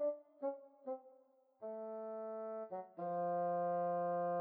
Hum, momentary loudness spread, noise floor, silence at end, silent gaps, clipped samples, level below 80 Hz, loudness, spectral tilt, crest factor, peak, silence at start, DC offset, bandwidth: none; 11 LU; -70 dBFS; 0 s; none; under 0.1%; under -90 dBFS; -42 LUFS; -10.5 dB/octave; 12 dB; -30 dBFS; 0 s; under 0.1%; 3 kHz